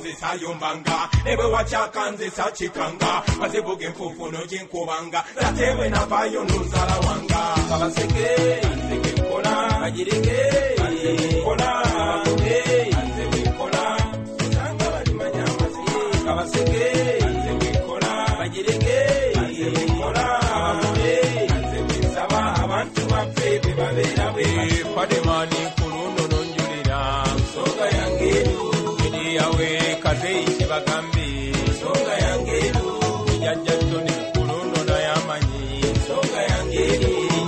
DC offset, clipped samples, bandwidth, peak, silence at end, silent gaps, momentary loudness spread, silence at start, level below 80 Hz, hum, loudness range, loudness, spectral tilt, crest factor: under 0.1%; under 0.1%; 12 kHz; -6 dBFS; 0 s; none; 5 LU; 0 s; -30 dBFS; none; 2 LU; -22 LUFS; -5 dB/octave; 14 dB